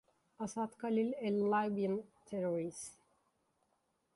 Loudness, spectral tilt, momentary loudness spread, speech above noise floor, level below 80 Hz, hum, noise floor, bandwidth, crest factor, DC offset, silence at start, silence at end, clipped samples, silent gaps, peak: -37 LUFS; -6 dB/octave; 12 LU; 44 dB; -80 dBFS; none; -80 dBFS; 11.5 kHz; 16 dB; under 0.1%; 0.4 s; 1.25 s; under 0.1%; none; -24 dBFS